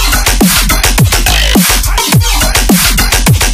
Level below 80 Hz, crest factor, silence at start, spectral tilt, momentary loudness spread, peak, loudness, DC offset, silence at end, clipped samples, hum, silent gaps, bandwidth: -12 dBFS; 8 dB; 0 s; -3 dB/octave; 2 LU; 0 dBFS; -8 LUFS; under 0.1%; 0 s; 0.3%; none; none; 16 kHz